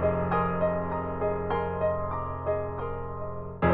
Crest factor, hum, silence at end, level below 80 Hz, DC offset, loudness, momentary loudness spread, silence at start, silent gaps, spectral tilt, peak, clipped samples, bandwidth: 16 dB; none; 0 s; -44 dBFS; under 0.1%; -30 LUFS; 9 LU; 0 s; none; -11.5 dB/octave; -12 dBFS; under 0.1%; 4.5 kHz